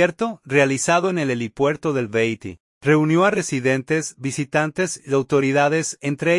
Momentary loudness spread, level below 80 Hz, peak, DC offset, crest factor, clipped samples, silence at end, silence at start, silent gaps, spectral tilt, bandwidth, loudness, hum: 8 LU; -60 dBFS; -4 dBFS; under 0.1%; 16 dB; under 0.1%; 0 s; 0 s; 2.60-2.81 s; -5 dB/octave; 11.5 kHz; -20 LUFS; none